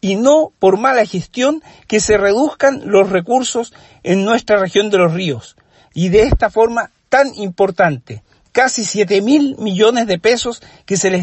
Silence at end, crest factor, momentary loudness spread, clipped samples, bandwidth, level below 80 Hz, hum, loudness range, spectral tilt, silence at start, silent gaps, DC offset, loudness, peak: 0 s; 14 dB; 10 LU; under 0.1%; 8.6 kHz; -34 dBFS; none; 2 LU; -4.5 dB/octave; 0.05 s; none; under 0.1%; -14 LUFS; 0 dBFS